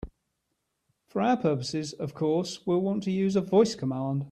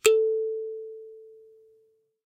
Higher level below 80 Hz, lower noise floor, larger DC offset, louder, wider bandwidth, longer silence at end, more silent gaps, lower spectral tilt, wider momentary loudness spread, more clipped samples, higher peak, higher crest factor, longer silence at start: first, -56 dBFS vs -76 dBFS; first, -79 dBFS vs -66 dBFS; neither; about the same, -27 LUFS vs -27 LUFS; second, 11 kHz vs 16 kHz; second, 0 s vs 0.95 s; neither; first, -6.5 dB/octave vs 0 dB/octave; second, 9 LU vs 24 LU; neither; second, -10 dBFS vs -6 dBFS; about the same, 18 dB vs 22 dB; about the same, 0.05 s vs 0.05 s